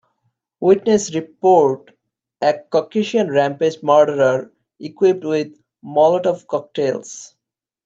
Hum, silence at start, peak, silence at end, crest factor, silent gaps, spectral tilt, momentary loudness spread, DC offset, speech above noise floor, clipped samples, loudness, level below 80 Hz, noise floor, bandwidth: none; 0.6 s; -2 dBFS; 0.6 s; 16 dB; none; -5.5 dB/octave; 13 LU; under 0.1%; 53 dB; under 0.1%; -17 LUFS; -66 dBFS; -70 dBFS; 8 kHz